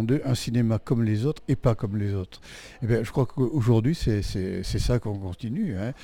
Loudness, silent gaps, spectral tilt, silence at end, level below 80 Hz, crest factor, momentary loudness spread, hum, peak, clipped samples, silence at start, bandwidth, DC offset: -26 LUFS; none; -7 dB/octave; 0 s; -40 dBFS; 16 dB; 10 LU; none; -8 dBFS; under 0.1%; 0 s; 15.5 kHz; under 0.1%